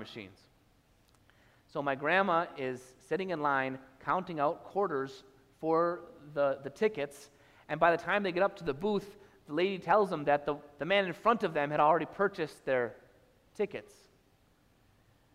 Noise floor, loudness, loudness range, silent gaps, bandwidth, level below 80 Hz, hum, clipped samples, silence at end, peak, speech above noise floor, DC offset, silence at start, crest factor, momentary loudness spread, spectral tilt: -67 dBFS; -32 LUFS; 4 LU; none; 14.5 kHz; -68 dBFS; none; under 0.1%; 1.55 s; -12 dBFS; 36 dB; under 0.1%; 0 s; 22 dB; 13 LU; -6 dB/octave